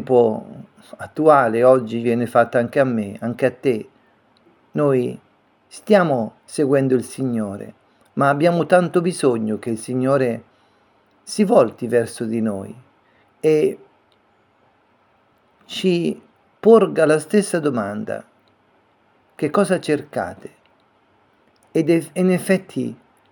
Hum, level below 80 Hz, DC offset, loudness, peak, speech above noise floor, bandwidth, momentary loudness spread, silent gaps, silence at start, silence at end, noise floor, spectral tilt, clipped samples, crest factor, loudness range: none; -68 dBFS; under 0.1%; -19 LUFS; 0 dBFS; 41 dB; 18 kHz; 15 LU; none; 0 s; 0.35 s; -59 dBFS; -6.5 dB/octave; under 0.1%; 20 dB; 7 LU